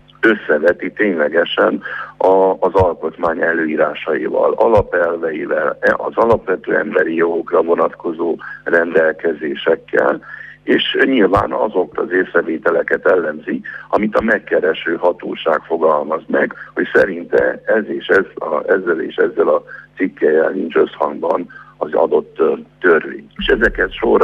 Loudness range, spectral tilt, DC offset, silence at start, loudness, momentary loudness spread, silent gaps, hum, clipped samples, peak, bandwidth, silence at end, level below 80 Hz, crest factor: 2 LU; -7 dB/octave; under 0.1%; 0.2 s; -16 LUFS; 7 LU; none; 50 Hz at -50 dBFS; under 0.1%; 0 dBFS; 6.8 kHz; 0 s; -42 dBFS; 16 dB